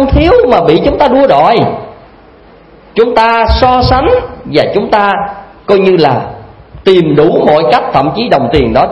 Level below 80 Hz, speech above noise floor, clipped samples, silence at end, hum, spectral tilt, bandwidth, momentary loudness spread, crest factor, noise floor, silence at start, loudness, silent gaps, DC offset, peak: -24 dBFS; 30 dB; 0.9%; 0 s; none; -7.5 dB/octave; 9.2 kHz; 8 LU; 8 dB; -38 dBFS; 0 s; -8 LUFS; none; 0.2%; 0 dBFS